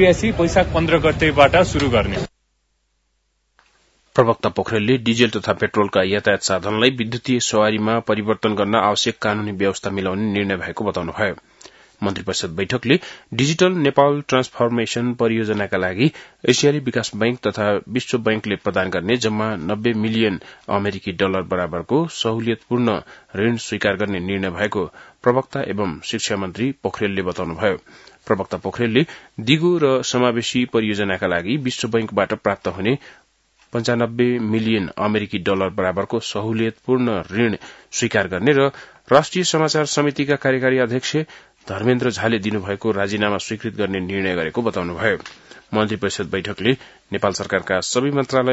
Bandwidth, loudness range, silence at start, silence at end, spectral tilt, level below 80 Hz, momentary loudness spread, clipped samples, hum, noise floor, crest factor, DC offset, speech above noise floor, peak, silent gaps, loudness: 8 kHz; 4 LU; 0 s; 0 s; -5 dB/octave; -46 dBFS; 7 LU; under 0.1%; none; -68 dBFS; 20 dB; under 0.1%; 48 dB; 0 dBFS; none; -20 LUFS